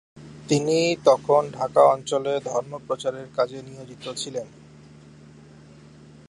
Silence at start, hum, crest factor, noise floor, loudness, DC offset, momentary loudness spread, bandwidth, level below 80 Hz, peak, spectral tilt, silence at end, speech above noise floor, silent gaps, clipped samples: 0.15 s; none; 20 dB; -48 dBFS; -23 LUFS; under 0.1%; 18 LU; 11.5 kHz; -62 dBFS; -4 dBFS; -5 dB/octave; 1.8 s; 25 dB; none; under 0.1%